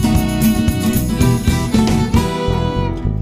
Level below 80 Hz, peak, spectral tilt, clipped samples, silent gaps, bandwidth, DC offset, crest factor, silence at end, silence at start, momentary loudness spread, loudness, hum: -24 dBFS; -2 dBFS; -6 dB/octave; under 0.1%; none; 15.5 kHz; under 0.1%; 14 dB; 0 s; 0 s; 4 LU; -16 LUFS; none